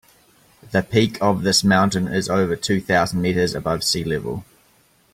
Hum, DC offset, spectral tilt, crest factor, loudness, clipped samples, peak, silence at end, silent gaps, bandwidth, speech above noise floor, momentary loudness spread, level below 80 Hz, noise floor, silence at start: none; under 0.1%; -4.5 dB/octave; 18 dB; -20 LUFS; under 0.1%; -4 dBFS; 0.7 s; none; 16 kHz; 38 dB; 7 LU; -50 dBFS; -58 dBFS; 0.7 s